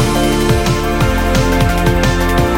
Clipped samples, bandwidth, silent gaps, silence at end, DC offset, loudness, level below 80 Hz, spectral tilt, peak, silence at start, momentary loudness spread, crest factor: under 0.1%; 17 kHz; none; 0 s; under 0.1%; -14 LUFS; -18 dBFS; -5.5 dB/octave; 0 dBFS; 0 s; 1 LU; 12 dB